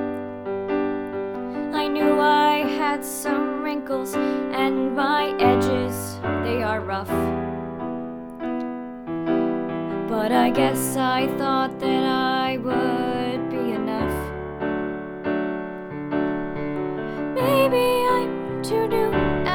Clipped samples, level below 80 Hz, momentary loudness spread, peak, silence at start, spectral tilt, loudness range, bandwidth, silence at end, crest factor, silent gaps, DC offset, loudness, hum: under 0.1%; -48 dBFS; 11 LU; -6 dBFS; 0 s; -5 dB/octave; 5 LU; over 20 kHz; 0 s; 18 dB; none; under 0.1%; -23 LUFS; none